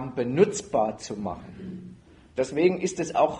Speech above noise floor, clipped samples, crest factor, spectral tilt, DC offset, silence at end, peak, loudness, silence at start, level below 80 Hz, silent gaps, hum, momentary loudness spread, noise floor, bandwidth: 23 dB; under 0.1%; 20 dB; -5.5 dB/octave; under 0.1%; 0 s; -6 dBFS; -26 LUFS; 0 s; -56 dBFS; none; none; 17 LU; -49 dBFS; 10.5 kHz